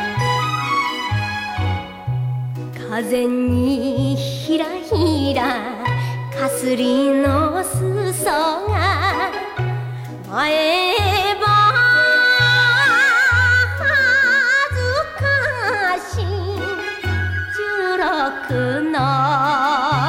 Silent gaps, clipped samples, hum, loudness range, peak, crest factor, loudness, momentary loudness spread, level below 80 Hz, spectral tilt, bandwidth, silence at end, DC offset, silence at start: none; under 0.1%; none; 8 LU; -4 dBFS; 14 dB; -17 LUFS; 11 LU; -42 dBFS; -5 dB/octave; 16 kHz; 0 s; under 0.1%; 0 s